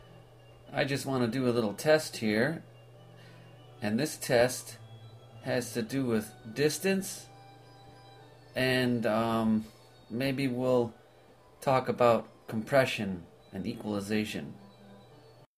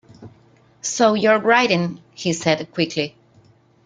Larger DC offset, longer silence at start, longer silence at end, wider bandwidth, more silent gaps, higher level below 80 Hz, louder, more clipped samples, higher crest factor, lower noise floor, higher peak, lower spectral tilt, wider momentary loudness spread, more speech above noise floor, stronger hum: neither; second, 0.05 s vs 0.2 s; second, 0.6 s vs 0.75 s; first, 15.5 kHz vs 9.6 kHz; neither; about the same, -64 dBFS vs -62 dBFS; second, -30 LUFS vs -19 LUFS; neither; about the same, 20 dB vs 20 dB; first, -58 dBFS vs -54 dBFS; second, -12 dBFS vs -2 dBFS; about the same, -5 dB/octave vs -4 dB/octave; first, 16 LU vs 12 LU; second, 29 dB vs 35 dB; neither